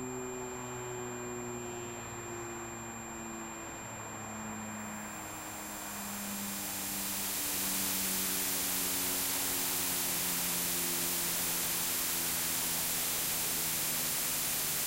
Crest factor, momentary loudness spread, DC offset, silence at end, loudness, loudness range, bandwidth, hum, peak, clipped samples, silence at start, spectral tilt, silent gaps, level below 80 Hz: 14 dB; 11 LU; under 0.1%; 0 s; -33 LUFS; 11 LU; 16 kHz; none; -22 dBFS; under 0.1%; 0 s; -1.5 dB/octave; none; -60 dBFS